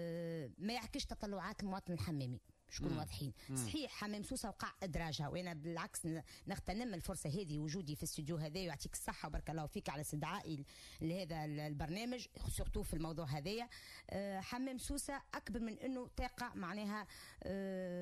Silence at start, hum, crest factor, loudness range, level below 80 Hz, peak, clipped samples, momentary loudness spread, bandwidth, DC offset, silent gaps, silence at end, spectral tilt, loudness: 0 s; none; 14 dB; 1 LU; -56 dBFS; -30 dBFS; under 0.1%; 4 LU; 15 kHz; under 0.1%; none; 0 s; -5 dB/octave; -45 LUFS